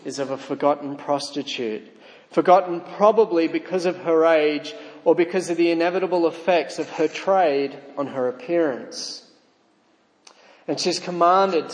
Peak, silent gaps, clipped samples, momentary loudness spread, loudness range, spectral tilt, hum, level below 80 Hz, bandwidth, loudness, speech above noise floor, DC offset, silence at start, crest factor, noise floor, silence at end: -2 dBFS; none; under 0.1%; 13 LU; 6 LU; -4.5 dB/octave; none; -82 dBFS; 10.5 kHz; -21 LUFS; 40 dB; under 0.1%; 0.05 s; 20 dB; -61 dBFS; 0 s